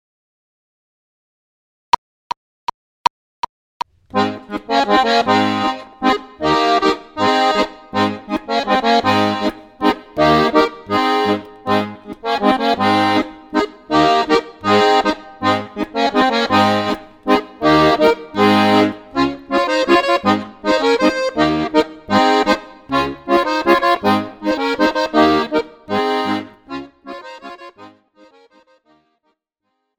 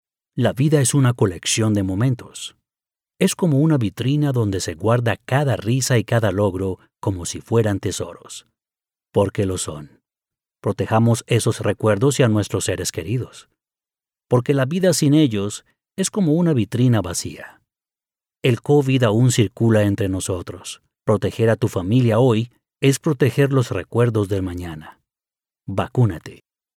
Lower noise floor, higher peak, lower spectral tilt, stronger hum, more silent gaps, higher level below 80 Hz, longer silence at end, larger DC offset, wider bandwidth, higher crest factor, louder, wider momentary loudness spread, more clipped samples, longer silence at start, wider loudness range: second, -73 dBFS vs under -90 dBFS; first, 0 dBFS vs -4 dBFS; about the same, -5 dB/octave vs -6 dB/octave; neither; neither; about the same, -48 dBFS vs -52 dBFS; first, 2.1 s vs 0.4 s; neither; about the same, 17 kHz vs 16 kHz; about the same, 16 dB vs 16 dB; first, -16 LUFS vs -19 LUFS; about the same, 14 LU vs 12 LU; neither; first, 4.15 s vs 0.35 s; first, 9 LU vs 4 LU